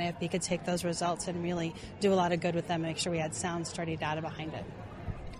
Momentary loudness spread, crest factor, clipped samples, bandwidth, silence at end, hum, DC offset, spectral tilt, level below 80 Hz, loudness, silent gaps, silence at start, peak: 12 LU; 16 dB; under 0.1%; 14 kHz; 0 s; none; under 0.1%; -4.5 dB/octave; -54 dBFS; -33 LUFS; none; 0 s; -16 dBFS